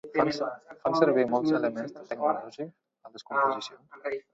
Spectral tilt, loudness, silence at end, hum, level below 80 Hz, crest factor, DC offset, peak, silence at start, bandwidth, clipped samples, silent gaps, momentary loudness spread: -6 dB/octave; -28 LUFS; 0.15 s; none; -70 dBFS; 22 dB; under 0.1%; -8 dBFS; 0.05 s; 7.8 kHz; under 0.1%; none; 17 LU